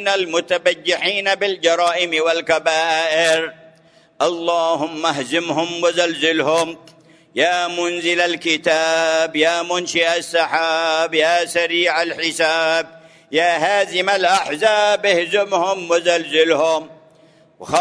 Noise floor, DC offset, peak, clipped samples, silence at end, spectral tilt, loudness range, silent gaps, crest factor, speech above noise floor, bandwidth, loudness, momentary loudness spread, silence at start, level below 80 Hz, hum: -51 dBFS; under 0.1%; -2 dBFS; under 0.1%; 0 s; -2 dB/octave; 2 LU; none; 16 dB; 34 dB; 11 kHz; -17 LUFS; 5 LU; 0 s; -66 dBFS; none